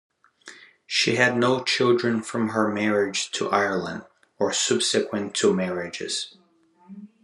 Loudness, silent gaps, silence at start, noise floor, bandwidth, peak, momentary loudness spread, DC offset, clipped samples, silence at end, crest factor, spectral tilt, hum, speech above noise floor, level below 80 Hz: -23 LUFS; none; 0.45 s; -57 dBFS; 12 kHz; -4 dBFS; 9 LU; under 0.1%; under 0.1%; 0.2 s; 22 dB; -3.5 dB/octave; none; 34 dB; -72 dBFS